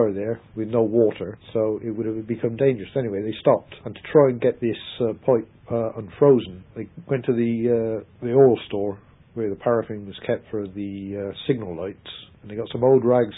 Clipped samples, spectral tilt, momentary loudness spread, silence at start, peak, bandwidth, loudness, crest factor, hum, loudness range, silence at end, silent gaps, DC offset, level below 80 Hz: under 0.1%; -12 dB/octave; 16 LU; 0 s; -4 dBFS; 4 kHz; -23 LUFS; 20 dB; none; 6 LU; 0 s; none; under 0.1%; -56 dBFS